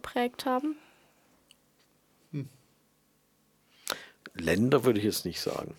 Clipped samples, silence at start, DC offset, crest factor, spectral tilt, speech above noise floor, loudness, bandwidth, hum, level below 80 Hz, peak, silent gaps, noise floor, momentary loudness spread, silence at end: under 0.1%; 0.05 s; under 0.1%; 22 dB; -5 dB/octave; 40 dB; -30 LUFS; 19 kHz; none; -64 dBFS; -10 dBFS; none; -69 dBFS; 18 LU; 0.05 s